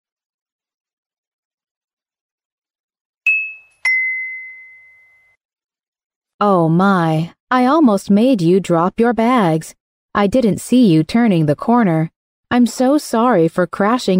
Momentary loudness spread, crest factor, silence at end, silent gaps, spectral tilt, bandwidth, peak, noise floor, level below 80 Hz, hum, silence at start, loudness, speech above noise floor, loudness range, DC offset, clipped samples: 9 LU; 12 dB; 0 s; 5.45-5.49 s, 5.88-5.93 s, 6.05-6.10 s, 6.16-6.22 s, 6.34-6.39 s, 7.40-7.47 s, 9.80-10.09 s, 12.16-12.43 s; -6.5 dB/octave; 16 kHz; -4 dBFS; -53 dBFS; -52 dBFS; none; 3.25 s; -15 LUFS; 39 dB; 7 LU; under 0.1%; under 0.1%